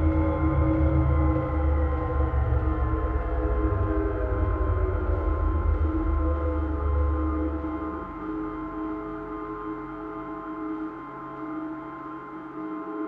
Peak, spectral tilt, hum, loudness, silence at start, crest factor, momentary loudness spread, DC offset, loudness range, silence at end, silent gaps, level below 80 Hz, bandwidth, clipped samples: -12 dBFS; -11.5 dB/octave; none; -28 LUFS; 0 s; 14 dB; 12 LU; under 0.1%; 9 LU; 0 s; none; -28 dBFS; 3.5 kHz; under 0.1%